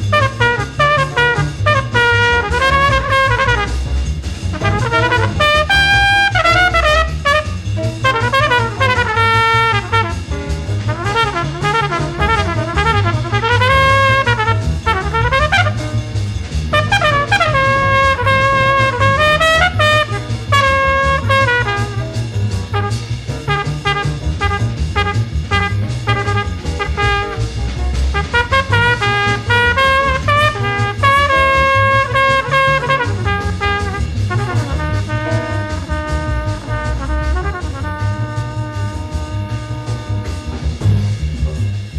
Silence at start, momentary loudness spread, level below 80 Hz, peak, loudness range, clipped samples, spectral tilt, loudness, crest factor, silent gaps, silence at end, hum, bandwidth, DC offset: 0 s; 10 LU; -26 dBFS; 0 dBFS; 8 LU; under 0.1%; -5 dB/octave; -14 LUFS; 14 dB; none; 0 s; none; 13 kHz; under 0.1%